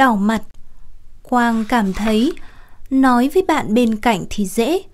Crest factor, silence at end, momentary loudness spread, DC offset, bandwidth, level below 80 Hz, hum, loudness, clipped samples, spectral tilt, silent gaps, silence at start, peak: 16 dB; 0.05 s; 7 LU; under 0.1%; 16 kHz; -36 dBFS; none; -17 LUFS; under 0.1%; -5.5 dB/octave; none; 0 s; -2 dBFS